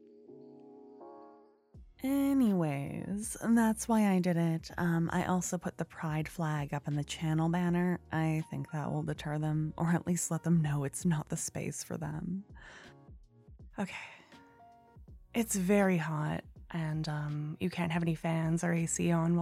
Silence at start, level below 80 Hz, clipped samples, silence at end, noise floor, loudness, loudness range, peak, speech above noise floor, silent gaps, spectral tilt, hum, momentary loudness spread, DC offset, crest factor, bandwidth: 0.3 s; -60 dBFS; under 0.1%; 0 s; -59 dBFS; -33 LUFS; 8 LU; -16 dBFS; 27 dB; none; -6 dB/octave; none; 13 LU; under 0.1%; 16 dB; 15.5 kHz